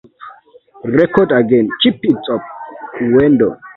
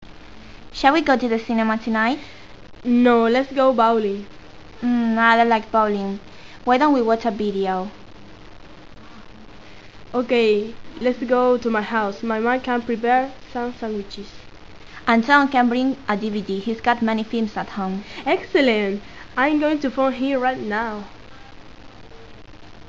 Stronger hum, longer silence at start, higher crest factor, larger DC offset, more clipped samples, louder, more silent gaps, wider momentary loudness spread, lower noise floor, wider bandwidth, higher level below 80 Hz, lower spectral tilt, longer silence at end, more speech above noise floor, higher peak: neither; first, 0.2 s vs 0 s; second, 14 dB vs 20 dB; second, under 0.1% vs 0.7%; neither; first, -13 LUFS vs -20 LUFS; neither; first, 17 LU vs 14 LU; about the same, -44 dBFS vs -43 dBFS; second, 4.4 kHz vs 7.6 kHz; about the same, -48 dBFS vs -48 dBFS; first, -8.5 dB/octave vs -6 dB/octave; about the same, 0.05 s vs 0 s; first, 31 dB vs 23 dB; about the same, 0 dBFS vs 0 dBFS